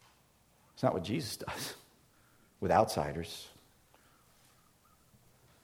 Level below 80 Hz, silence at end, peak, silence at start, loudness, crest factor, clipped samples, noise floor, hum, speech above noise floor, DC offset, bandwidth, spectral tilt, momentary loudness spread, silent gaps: -62 dBFS; 2.15 s; -12 dBFS; 0.75 s; -34 LUFS; 26 dB; under 0.1%; -67 dBFS; none; 34 dB; under 0.1%; 18 kHz; -5 dB/octave; 17 LU; none